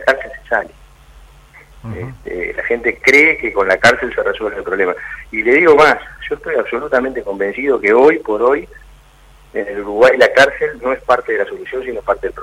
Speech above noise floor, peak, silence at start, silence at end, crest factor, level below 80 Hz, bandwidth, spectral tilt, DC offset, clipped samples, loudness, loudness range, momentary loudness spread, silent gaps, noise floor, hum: 30 dB; 0 dBFS; 0 s; 0 s; 16 dB; -42 dBFS; 15 kHz; -4.5 dB/octave; under 0.1%; under 0.1%; -14 LUFS; 3 LU; 15 LU; none; -44 dBFS; none